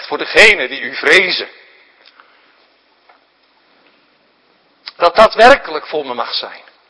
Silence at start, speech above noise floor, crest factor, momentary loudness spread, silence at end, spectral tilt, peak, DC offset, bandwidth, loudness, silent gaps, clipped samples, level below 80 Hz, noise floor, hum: 0 s; 43 dB; 16 dB; 19 LU; 0.3 s; -2 dB/octave; 0 dBFS; under 0.1%; 11 kHz; -11 LUFS; none; 1%; -46 dBFS; -55 dBFS; none